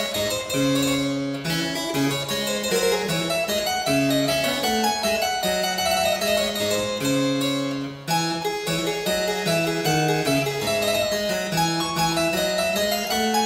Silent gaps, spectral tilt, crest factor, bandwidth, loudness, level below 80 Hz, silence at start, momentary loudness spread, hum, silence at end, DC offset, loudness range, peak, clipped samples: none; -3.5 dB/octave; 14 dB; 16.5 kHz; -22 LUFS; -50 dBFS; 0 s; 4 LU; none; 0 s; under 0.1%; 2 LU; -10 dBFS; under 0.1%